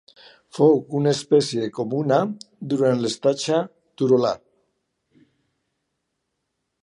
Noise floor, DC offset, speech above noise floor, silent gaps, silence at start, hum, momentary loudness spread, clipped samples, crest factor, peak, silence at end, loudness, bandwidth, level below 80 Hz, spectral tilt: -77 dBFS; under 0.1%; 57 dB; none; 0.55 s; none; 11 LU; under 0.1%; 18 dB; -4 dBFS; 2.45 s; -21 LUFS; 11 kHz; -68 dBFS; -6 dB/octave